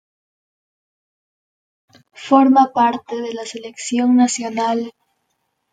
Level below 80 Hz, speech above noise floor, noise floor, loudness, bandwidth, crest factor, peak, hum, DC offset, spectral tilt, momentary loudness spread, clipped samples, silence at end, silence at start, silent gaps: -70 dBFS; 55 dB; -71 dBFS; -17 LUFS; 9.4 kHz; 18 dB; -2 dBFS; none; under 0.1%; -3.5 dB/octave; 16 LU; under 0.1%; 0.8 s; 2.2 s; none